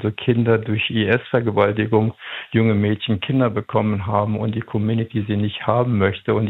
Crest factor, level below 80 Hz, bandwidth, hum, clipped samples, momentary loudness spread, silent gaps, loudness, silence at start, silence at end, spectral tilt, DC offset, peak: 18 dB; -56 dBFS; 4.1 kHz; none; under 0.1%; 5 LU; none; -20 LUFS; 0 s; 0 s; -10 dB/octave; under 0.1%; -2 dBFS